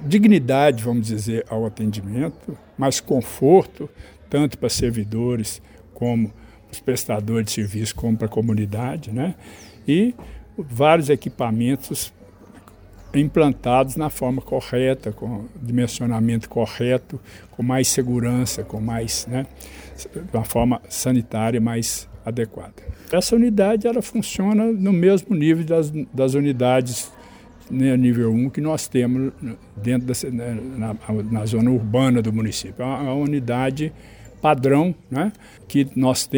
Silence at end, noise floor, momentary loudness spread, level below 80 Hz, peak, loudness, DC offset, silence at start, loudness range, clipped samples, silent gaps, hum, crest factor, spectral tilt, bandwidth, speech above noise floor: 0 s; -45 dBFS; 12 LU; -46 dBFS; 0 dBFS; -21 LUFS; under 0.1%; 0 s; 5 LU; under 0.1%; none; none; 20 dB; -6 dB/octave; over 20 kHz; 25 dB